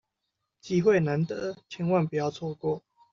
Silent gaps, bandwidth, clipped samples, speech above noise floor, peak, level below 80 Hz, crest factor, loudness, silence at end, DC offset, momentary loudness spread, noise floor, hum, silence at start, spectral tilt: none; 7.4 kHz; under 0.1%; 56 dB; -10 dBFS; -66 dBFS; 18 dB; -28 LUFS; 0.35 s; under 0.1%; 11 LU; -82 dBFS; none; 0.65 s; -7 dB/octave